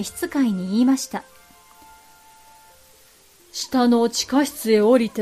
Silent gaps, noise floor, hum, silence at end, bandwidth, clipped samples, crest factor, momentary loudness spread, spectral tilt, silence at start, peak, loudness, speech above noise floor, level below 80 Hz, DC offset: none; -53 dBFS; none; 0 s; 15.5 kHz; under 0.1%; 16 dB; 14 LU; -4.5 dB/octave; 0 s; -6 dBFS; -20 LUFS; 33 dB; -62 dBFS; under 0.1%